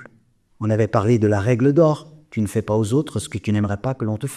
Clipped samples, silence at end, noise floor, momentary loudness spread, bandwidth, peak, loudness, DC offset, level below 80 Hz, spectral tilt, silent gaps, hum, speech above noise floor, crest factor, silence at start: under 0.1%; 0 s; -57 dBFS; 10 LU; 13.5 kHz; -4 dBFS; -20 LUFS; under 0.1%; -52 dBFS; -7.5 dB/octave; none; none; 38 dB; 16 dB; 0 s